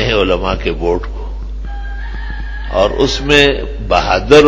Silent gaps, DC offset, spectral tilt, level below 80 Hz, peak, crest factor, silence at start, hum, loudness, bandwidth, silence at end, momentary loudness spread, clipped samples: none; under 0.1%; -5 dB/octave; -22 dBFS; 0 dBFS; 14 dB; 0 s; none; -13 LUFS; 8 kHz; 0 s; 17 LU; 0.5%